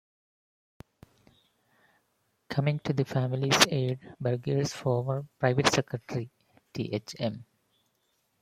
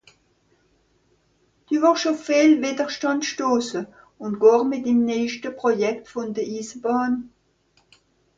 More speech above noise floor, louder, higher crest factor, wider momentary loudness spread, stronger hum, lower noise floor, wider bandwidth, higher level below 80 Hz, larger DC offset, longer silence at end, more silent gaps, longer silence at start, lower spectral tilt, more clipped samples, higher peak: about the same, 46 dB vs 43 dB; second, -29 LUFS vs -22 LUFS; first, 28 dB vs 18 dB; about the same, 14 LU vs 13 LU; neither; first, -75 dBFS vs -64 dBFS; first, 16 kHz vs 7.8 kHz; about the same, -64 dBFS vs -66 dBFS; neither; about the same, 1 s vs 1.1 s; neither; first, 2.5 s vs 1.7 s; about the same, -4.5 dB/octave vs -4 dB/octave; neither; about the same, -4 dBFS vs -4 dBFS